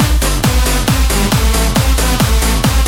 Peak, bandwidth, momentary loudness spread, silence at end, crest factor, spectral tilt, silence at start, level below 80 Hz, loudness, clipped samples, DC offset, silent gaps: 0 dBFS; 18 kHz; 1 LU; 0 s; 10 dB; -4 dB/octave; 0 s; -14 dBFS; -13 LUFS; under 0.1%; under 0.1%; none